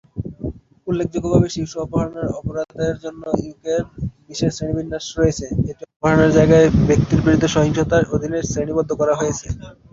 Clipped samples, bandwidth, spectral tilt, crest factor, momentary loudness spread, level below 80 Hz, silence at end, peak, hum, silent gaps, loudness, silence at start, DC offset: under 0.1%; 7.8 kHz; -6.5 dB/octave; 16 dB; 15 LU; -36 dBFS; 0.2 s; -2 dBFS; none; 5.96-6.00 s; -19 LUFS; 0.15 s; under 0.1%